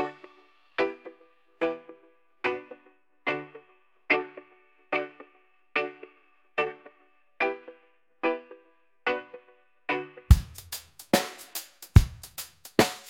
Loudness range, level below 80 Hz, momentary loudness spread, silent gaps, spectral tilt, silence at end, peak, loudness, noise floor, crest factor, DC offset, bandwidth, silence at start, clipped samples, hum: 7 LU; -36 dBFS; 21 LU; none; -5.5 dB/octave; 0 s; -2 dBFS; -29 LUFS; -65 dBFS; 28 dB; under 0.1%; 17 kHz; 0 s; under 0.1%; none